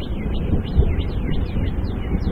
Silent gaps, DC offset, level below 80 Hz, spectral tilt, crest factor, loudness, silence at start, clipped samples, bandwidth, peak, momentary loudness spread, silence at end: none; under 0.1%; -22 dBFS; -9.5 dB/octave; 18 dB; -24 LUFS; 0 s; under 0.1%; 5.4 kHz; -4 dBFS; 5 LU; 0 s